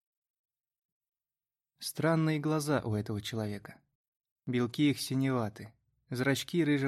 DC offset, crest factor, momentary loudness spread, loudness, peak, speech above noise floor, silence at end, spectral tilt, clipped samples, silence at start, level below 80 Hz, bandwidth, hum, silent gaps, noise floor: under 0.1%; 18 dB; 12 LU; -32 LUFS; -16 dBFS; over 59 dB; 0 s; -6 dB/octave; under 0.1%; 1.8 s; -70 dBFS; 15.5 kHz; none; 3.95-4.20 s, 4.31-4.36 s; under -90 dBFS